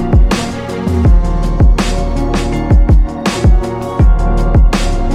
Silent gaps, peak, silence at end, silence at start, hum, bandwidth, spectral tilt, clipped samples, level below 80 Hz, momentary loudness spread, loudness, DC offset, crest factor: none; 0 dBFS; 0 s; 0 s; none; 10.5 kHz; -6.5 dB/octave; under 0.1%; -12 dBFS; 5 LU; -13 LUFS; under 0.1%; 10 dB